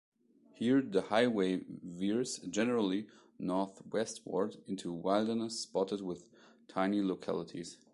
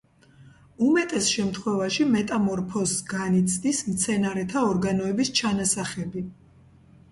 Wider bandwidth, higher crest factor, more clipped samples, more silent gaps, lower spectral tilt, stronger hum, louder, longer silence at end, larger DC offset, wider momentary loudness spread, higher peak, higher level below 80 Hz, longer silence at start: about the same, 11.5 kHz vs 11.5 kHz; about the same, 20 dB vs 16 dB; neither; neither; about the same, -5 dB/octave vs -4 dB/octave; neither; second, -35 LUFS vs -24 LUFS; second, 0.2 s vs 0.8 s; neither; first, 12 LU vs 5 LU; second, -16 dBFS vs -10 dBFS; second, -74 dBFS vs -56 dBFS; first, 0.6 s vs 0.4 s